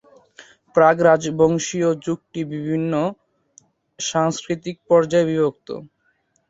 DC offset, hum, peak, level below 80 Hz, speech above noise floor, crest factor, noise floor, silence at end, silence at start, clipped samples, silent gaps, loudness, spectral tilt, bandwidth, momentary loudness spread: under 0.1%; none; -2 dBFS; -60 dBFS; 47 dB; 20 dB; -66 dBFS; 0.65 s; 0.4 s; under 0.1%; none; -20 LUFS; -5.5 dB/octave; 8 kHz; 12 LU